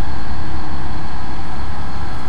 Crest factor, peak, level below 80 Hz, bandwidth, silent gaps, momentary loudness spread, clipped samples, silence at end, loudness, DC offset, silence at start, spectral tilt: 12 dB; -4 dBFS; -30 dBFS; 12 kHz; none; 1 LU; under 0.1%; 0 s; -28 LUFS; 40%; 0 s; -6.5 dB/octave